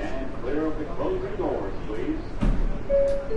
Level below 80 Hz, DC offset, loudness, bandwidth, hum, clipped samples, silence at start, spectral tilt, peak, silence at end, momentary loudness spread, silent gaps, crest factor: -30 dBFS; under 0.1%; -28 LUFS; 8.2 kHz; none; under 0.1%; 0 s; -8 dB/octave; -12 dBFS; 0 s; 8 LU; none; 14 dB